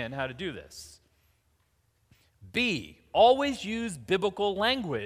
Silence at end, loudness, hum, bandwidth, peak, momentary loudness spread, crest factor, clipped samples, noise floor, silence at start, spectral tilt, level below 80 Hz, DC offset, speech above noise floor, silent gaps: 0 s; -28 LUFS; none; 15.5 kHz; -10 dBFS; 16 LU; 20 dB; under 0.1%; -71 dBFS; 0 s; -4.5 dB/octave; -58 dBFS; under 0.1%; 42 dB; none